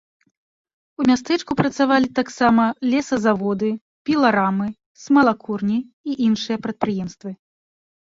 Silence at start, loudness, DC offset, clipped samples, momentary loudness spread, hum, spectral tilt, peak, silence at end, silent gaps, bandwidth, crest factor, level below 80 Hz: 1 s; -20 LUFS; under 0.1%; under 0.1%; 12 LU; none; -6 dB/octave; -2 dBFS; 0.75 s; 3.81-4.05 s, 4.86-4.95 s, 5.93-6.04 s; 7.8 kHz; 18 dB; -56 dBFS